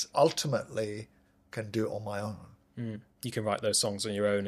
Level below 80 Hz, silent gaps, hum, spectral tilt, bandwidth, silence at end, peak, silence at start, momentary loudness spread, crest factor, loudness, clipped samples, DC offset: -68 dBFS; none; none; -4 dB/octave; 15 kHz; 0 s; -12 dBFS; 0 s; 16 LU; 20 dB; -32 LUFS; under 0.1%; under 0.1%